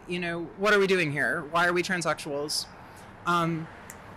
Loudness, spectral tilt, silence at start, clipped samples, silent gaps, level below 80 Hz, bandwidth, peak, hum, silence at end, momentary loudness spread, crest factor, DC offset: -27 LUFS; -4 dB/octave; 0 s; under 0.1%; none; -60 dBFS; 16 kHz; -14 dBFS; none; 0 s; 18 LU; 14 dB; under 0.1%